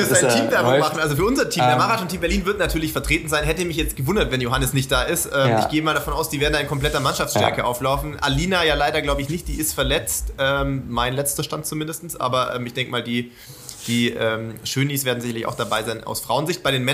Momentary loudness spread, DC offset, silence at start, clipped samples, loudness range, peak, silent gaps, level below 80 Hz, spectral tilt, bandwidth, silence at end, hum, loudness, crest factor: 8 LU; under 0.1%; 0 s; under 0.1%; 4 LU; -2 dBFS; none; -34 dBFS; -4 dB/octave; 15.5 kHz; 0 s; none; -21 LUFS; 20 dB